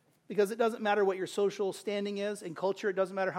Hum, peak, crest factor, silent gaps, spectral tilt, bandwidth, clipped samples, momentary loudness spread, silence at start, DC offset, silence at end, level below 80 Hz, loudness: none; -16 dBFS; 16 dB; none; -5 dB/octave; 15.5 kHz; under 0.1%; 6 LU; 0.3 s; under 0.1%; 0 s; -84 dBFS; -32 LUFS